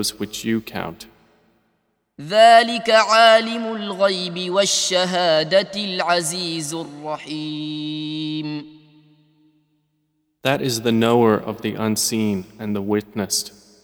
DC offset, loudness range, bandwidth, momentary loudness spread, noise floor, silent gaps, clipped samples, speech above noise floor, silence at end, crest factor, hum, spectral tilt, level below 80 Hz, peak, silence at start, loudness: under 0.1%; 12 LU; over 20 kHz; 15 LU; -69 dBFS; none; under 0.1%; 50 dB; 0.35 s; 20 dB; none; -3.5 dB/octave; -62 dBFS; 0 dBFS; 0 s; -19 LUFS